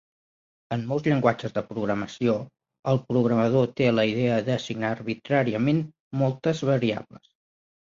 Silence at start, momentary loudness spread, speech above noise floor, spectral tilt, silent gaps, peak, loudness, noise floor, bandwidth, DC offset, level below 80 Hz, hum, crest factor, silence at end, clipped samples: 0.7 s; 9 LU; over 66 dB; -7.5 dB/octave; 2.79-2.83 s, 6.00-6.11 s; -6 dBFS; -25 LUFS; under -90 dBFS; 7.6 kHz; under 0.1%; -62 dBFS; none; 20 dB; 0.9 s; under 0.1%